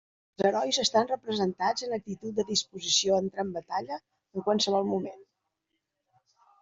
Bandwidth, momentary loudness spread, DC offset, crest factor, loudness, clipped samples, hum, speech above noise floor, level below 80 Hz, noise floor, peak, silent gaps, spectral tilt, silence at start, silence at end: 8 kHz; 10 LU; under 0.1%; 18 dB; -28 LUFS; under 0.1%; none; 54 dB; -72 dBFS; -82 dBFS; -12 dBFS; none; -3 dB/octave; 0.4 s; 1.4 s